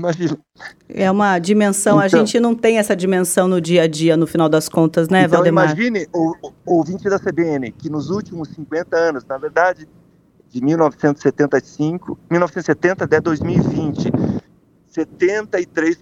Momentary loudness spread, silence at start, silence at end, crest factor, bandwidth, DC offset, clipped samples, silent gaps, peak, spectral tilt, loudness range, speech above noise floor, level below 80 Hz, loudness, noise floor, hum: 11 LU; 0 s; 0.1 s; 16 dB; 15.5 kHz; under 0.1%; under 0.1%; none; 0 dBFS; -5.5 dB/octave; 6 LU; 36 dB; -52 dBFS; -17 LUFS; -53 dBFS; none